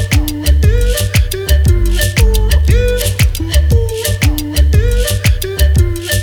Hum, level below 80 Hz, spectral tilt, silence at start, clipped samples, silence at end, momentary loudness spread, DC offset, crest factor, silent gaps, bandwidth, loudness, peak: none; -12 dBFS; -5 dB/octave; 0 s; under 0.1%; 0 s; 3 LU; under 0.1%; 10 dB; none; over 20 kHz; -13 LUFS; 0 dBFS